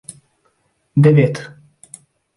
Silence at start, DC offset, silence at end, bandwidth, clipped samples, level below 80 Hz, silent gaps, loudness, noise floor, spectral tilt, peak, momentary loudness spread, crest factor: 0.95 s; under 0.1%; 0.9 s; 11.5 kHz; under 0.1%; -58 dBFS; none; -14 LUFS; -63 dBFS; -8 dB/octave; -2 dBFS; 26 LU; 18 dB